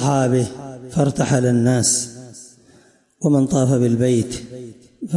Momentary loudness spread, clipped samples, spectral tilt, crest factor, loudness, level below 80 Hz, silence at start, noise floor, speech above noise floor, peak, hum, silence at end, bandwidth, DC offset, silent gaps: 19 LU; under 0.1%; -5.5 dB/octave; 14 dB; -18 LUFS; -52 dBFS; 0 s; -53 dBFS; 36 dB; -6 dBFS; none; 0 s; 11.5 kHz; under 0.1%; none